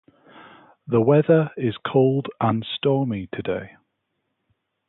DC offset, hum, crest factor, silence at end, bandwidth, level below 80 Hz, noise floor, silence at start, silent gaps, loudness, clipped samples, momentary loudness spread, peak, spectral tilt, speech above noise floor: under 0.1%; none; 18 dB; 1.2 s; 4.1 kHz; -58 dBFS; -76 dBFS; 0.35 s; none; -22 LUFS; under 0.1%; 11 LU; -6 dBFS; -12 dB/octave; 55 dB